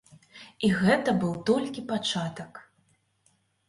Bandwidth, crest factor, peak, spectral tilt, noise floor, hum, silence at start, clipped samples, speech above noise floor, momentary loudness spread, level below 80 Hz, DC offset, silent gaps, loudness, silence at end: 11.5 kHz; 18 dB; -10 dBFS; -5.5 dB/octave; -69 dBFS; none; 0.35 s; under 0.1%; 42 dB; 21 LU; -62 dBFS; under 0.1%; none; -27 LUFS; 1.05 s